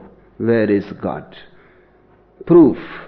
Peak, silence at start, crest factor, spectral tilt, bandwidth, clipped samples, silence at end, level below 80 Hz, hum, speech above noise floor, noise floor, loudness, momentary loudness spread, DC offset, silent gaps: -2 dBFS; 0.4 s; 16 dB; -11 dB/octave; 5 kHz; under 0.1%; 0.05 s; -50 dBFS; none; 36 dB; -51 dBFS; -15 LUFS; 15 LU; under 0.1%; none